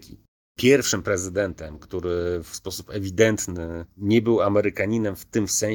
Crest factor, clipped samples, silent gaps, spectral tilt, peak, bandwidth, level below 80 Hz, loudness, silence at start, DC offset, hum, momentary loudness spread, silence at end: 20 dB; under 0.1%; 0.28-0.55 s; -4.5 dB/octave; -2 dBFS; 19.5 kHz; -48 dBFS; -23 LUFS; 0 s; under 0.1%; none; 13 LU; 0 s